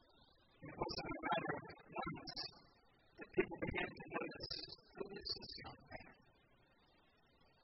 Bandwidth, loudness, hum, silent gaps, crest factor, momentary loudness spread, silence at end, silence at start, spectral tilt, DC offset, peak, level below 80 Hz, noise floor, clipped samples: 5.8 kHz; -46 LUFS; none; none; 24 dB; 15 LU; 1.35 s; 0.15 s; -2.5 dB/octave; under 0.1%; -24 dBFS; -66 dBFS; -73 dBFS; under 0.1%